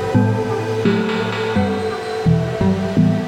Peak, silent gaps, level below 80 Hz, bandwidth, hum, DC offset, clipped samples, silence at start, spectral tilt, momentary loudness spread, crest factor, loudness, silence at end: -4 dBFS; none; -44 dBFS; 12 kHz; none; under 0.1%; under 0.1%; 0 s; -7.5 dB/octave; 4 LU; 14 dB; -18 LUFS; 0 s